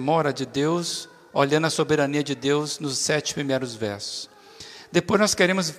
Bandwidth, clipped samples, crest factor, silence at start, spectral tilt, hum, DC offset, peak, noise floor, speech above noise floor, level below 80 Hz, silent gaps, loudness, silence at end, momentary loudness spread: 15.5 kHz; under 0.1%; 20 dB; 0 s; -4 dB/octave; none; under 0.1%; -4 dBFS; -44 dBFS; 21 dB; -62 dBFS; none; -24 LUFS; 0 s; 12 LU